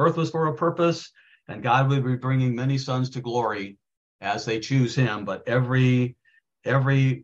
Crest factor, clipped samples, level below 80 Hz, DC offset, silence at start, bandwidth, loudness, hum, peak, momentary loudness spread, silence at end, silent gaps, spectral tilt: 16 dB; under 0.1%; -62 dBFS; under 0.1%; 0 s; 7.6 kHz; -24 LUFS; none; -8 dBFS; 12 LU; 0 s; 3.97-4.19 s; -7 dB/octave